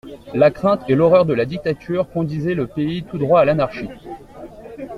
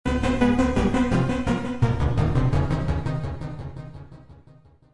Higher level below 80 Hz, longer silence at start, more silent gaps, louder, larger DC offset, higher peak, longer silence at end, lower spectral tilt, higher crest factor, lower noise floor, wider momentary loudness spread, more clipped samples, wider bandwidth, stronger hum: second, -48 dBFS vs -32 dBFS; about the same, 0.05 s vs 0.05 s; neither; first, -18 LUFS vs -23 LUFS; neither; first, -2 dBFS vs -8 dBFS; second, 0 s vs 0.6 s; about the same, -8.5 dB/octave vs -7.5 dB/octave; about the same, 16 dB vs 16 dB; second, -37 dBFS vs -52 dBFS; first, 22 LU vs 15 LU; neither; about the same, 10 kHz vs 11 kHz; neither